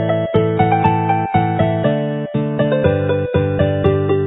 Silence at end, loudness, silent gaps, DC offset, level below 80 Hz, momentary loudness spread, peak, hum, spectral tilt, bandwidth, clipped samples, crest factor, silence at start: 0 s; -16 LUFS; none; under 0.1%; -36 dBFS; 4 LU; 0 dBFS; none; -11.5 dB/octave; 4 kHz; under 0.1%; 16 dB; 0 s